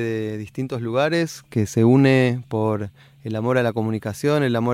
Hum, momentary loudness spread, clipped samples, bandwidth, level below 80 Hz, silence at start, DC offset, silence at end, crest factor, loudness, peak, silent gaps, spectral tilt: none; 13 LU; under 0.1%; 15.5 kHz; -58 dBFS; 0 s; under 0.1%; 0 s; 16 dB; -21 LUFS; -4 dBFS; none; -7 dB/octave